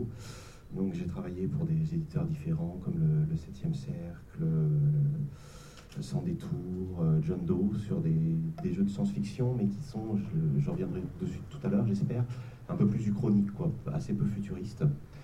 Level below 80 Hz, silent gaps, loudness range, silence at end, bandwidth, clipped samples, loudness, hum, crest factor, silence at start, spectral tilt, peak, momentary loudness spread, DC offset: -52 dBFS; none; 2 LU; 0 s; 9.4 kHz; under 0.1%; -32 LUFS; none; 16 dB; 0 s; -9 dB/octave; -16 dBFS; 11 LU; under 0.1%